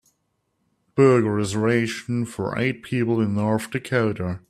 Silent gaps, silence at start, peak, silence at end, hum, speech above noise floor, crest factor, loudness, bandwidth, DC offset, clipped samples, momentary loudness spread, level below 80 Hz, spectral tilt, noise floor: none; 0.95 s; -4 dBFS; 0.1 s; none; 51 dB; 18 dB; -22 LUFS; 14 kHz; under 0.1%; under 0.1%; 9 LU; -58 dBFS; -6.5 dB/octave; -73 dBFS